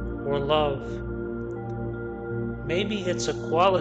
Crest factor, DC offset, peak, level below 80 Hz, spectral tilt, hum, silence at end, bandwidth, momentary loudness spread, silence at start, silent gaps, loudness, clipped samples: 18 dB; under 0.1%; -8 dBFS; -42 dBFS; -5.5 dB/octave; none; 0 s; 8.8 kHz; 10 LU; 0 s; none; -28 LUFS; under 0.1%